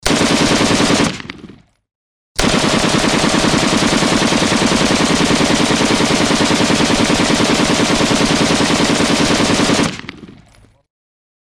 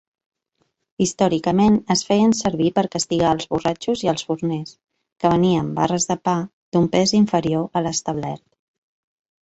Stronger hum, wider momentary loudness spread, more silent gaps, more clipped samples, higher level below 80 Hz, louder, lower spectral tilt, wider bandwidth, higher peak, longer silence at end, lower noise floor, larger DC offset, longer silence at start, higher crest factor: neither; second, 3 LU vs 8 LU; first, 1.95-2.35 s vs 5.12-5.16 s, 6.53-6.72 s; neither; first, -34 dBFS vs -52 dBFS; first, -13 LUFS vs -20 LUFS; second, -3.5 dB/octave vs -5 dB/octave; first, 16 kHz vs 8.4 kHz; about the same, -2 dBFS vs -4 dBFS; first, 1.25 s vs 1.05 s; second, -48 dBFS vs -70 dBFS; neither; second, 0.05 s vs 1 s; second, 12 dB vs 18 dB